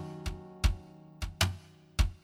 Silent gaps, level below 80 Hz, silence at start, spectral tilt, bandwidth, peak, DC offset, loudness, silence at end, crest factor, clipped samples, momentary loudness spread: none; -36 dBFS; 0 s; -4 dB/octave; 16.5 kHz; -12 dBFS; under 0.1%; -35 LUFS; 0.05 s; 22 dB; under 0.1%; 13 LU